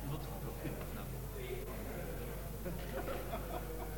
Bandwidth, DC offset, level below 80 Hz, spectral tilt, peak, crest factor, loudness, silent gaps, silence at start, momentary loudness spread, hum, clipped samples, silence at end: 17.5 kHz; under 0.1%; -46 dBFS; -5.5 dB/octave; -28 dBFS; 14 dB; -44 LUFS; none; 0 s; 3 LU; none; under 0.1%; 0 s